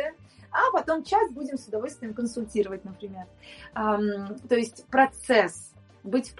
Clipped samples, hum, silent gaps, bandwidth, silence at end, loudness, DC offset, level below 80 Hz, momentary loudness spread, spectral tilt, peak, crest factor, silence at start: under 0.1%; none; none; 11.5 kHz; 0.05 s; -26 LUFS; under 0.1%; -58 dBFS; 18 LU; -4.5 dB/octave; -6 dBFS; 22 dB; 0 s